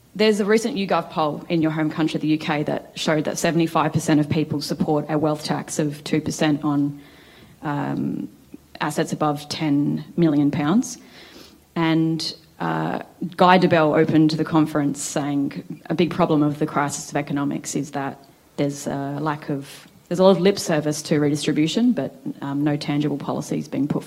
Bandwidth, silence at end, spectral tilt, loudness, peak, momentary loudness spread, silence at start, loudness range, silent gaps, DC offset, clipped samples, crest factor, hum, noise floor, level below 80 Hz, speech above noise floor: 16 kHz; 0 s; -5.5 dB/octave; -22 LUFS; 0 dBFS; 11 LU; 0.15 s; 6 LU; none; under 0.1%; under 0.1%; 22 dB; none; -48 dBFS; -60 dBFS; 27 dB